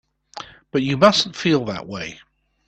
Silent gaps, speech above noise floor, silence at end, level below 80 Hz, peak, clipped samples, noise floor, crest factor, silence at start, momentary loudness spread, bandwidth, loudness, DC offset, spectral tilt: none; 20 dB; 0.55 s; -56 dBFS; 0 dBFS; under 0.1%; -39 dBFS; 22 dB; 0.35 s; 22 LU; 9 kHz; -19 LUFS; under 0.1%; -5 dB/octave